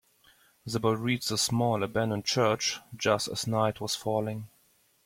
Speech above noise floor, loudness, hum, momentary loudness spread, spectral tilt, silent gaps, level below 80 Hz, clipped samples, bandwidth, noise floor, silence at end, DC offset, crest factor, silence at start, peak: 38 dB; -29 LUFS; none; 9 LU; -4 dB/octave; none; -64 dBFS; under 0.1%; 16.5 kHz; -66 dBFS; 0.6 s; under 0.1%; 20 dB; 0.65 s; -10 dBFS